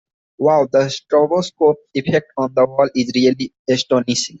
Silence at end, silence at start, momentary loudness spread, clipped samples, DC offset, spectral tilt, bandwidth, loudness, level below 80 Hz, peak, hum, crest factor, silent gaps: 0.05 s; 0.4 s; 4 LU; under 0.1%; under 0.1%; -5 dB/octave; 8.2 kHz; -17 LUFS; -58 dBFS; 0 dBFS; none; 16 dB; 3.59-3.65 s